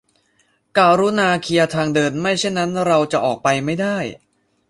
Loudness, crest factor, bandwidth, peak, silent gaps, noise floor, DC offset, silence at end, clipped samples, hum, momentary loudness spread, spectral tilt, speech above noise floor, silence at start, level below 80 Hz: -18 LUFS; 16 dB; 11.5 kHz; -2 dBFS; none; -62 dBFS; under 0.1%; 0.55 s; under 0.1%; none; 7 LU; -5 dB/octave; 45 dB; 0.75 s; -56 dBFS